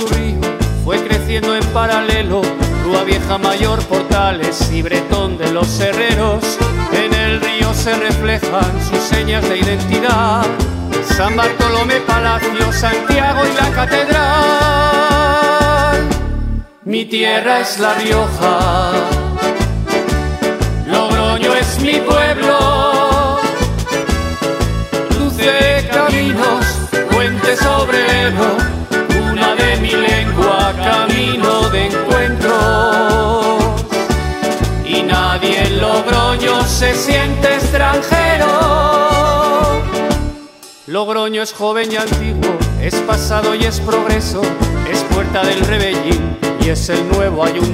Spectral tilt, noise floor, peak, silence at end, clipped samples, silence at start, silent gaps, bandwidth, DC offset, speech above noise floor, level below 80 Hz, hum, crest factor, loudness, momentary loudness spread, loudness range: -4.5 dB/octave; -36 dBFS; 0 dBFS; 0 s; under 0.1%; 0 s; none; 16 kHz; under 0.1%; 23 dB; -22 dBFS; none; 14 dB; -14 LUFS; 6 LU; 3 LU